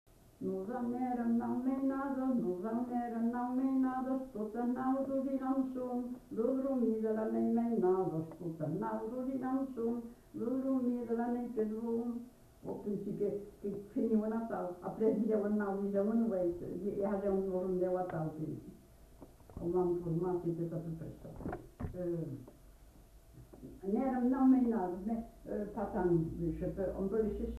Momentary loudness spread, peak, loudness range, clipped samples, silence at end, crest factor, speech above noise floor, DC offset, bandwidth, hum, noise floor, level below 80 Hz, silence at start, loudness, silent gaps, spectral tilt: 10 LU; -20 dBFS; 5 LU; under 0.1%; 0 s; 16 dB; 24 dB; under 0.1%; 13.5 kHz; none; -59 dBFS; -58 dBFS; 0.4 s; -36 LUFS; none; -9.5 dB/octave